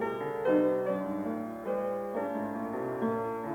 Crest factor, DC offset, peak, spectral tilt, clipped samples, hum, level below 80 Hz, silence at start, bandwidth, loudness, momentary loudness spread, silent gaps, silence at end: 16 dB; under 0.1%; -16 dBFS; -8 dB/octave; under 0.1%; none; -68 dBFS; 0 s; 17.5 kHz; -32 LUFS; 8 LU; none; 0 s